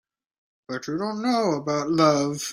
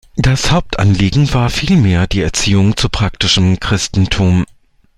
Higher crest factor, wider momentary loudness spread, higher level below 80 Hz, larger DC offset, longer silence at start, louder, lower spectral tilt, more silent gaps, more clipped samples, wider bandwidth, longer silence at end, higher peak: first, 20 dB vs 12 dB; first, 12 LU vs 4 LU; second, -66 dBFS vs -26 dBFS; neither; first, 0.7 s vs 0.15 s; second, -23 LUFS vs -13 LUFS; about the same, -5 dB/octave vs -5 dB/octave; neither; neither; first, 16 kHz vs 12.5 kHz; second, 0 s vs 0.55 s; second, -6 dBFS vs 0 dBFS